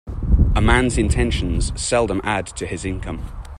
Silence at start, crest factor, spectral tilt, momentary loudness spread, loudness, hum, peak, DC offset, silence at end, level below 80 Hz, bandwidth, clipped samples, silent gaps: 0.05 s; 18 dB; -5 dB/octave; 11 LU; -20 LUFS; none; -2 dBFS; under 0.1%; 0 s; -22 dBFS; 11.5 kHz; under 0.1%; none